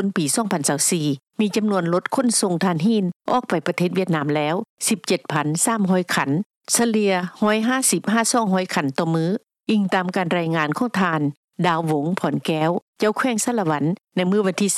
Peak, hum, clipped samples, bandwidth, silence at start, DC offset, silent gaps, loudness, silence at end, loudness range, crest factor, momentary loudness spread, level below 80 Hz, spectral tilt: -6 dBFS; none; under 0.1%; 14.5 kHz; 0 s; under 0.1%; 3.16-3.20 s, 4.69-4.77 s, 6.46-6.50 s, 6.57-6.61 s, 11.37-11.48 s, 12.82-12.93 s; -21 LUFS; 0 s; 2 LU; 14 dB; 5 LU; -72 dBFS; -4.5 dB/octave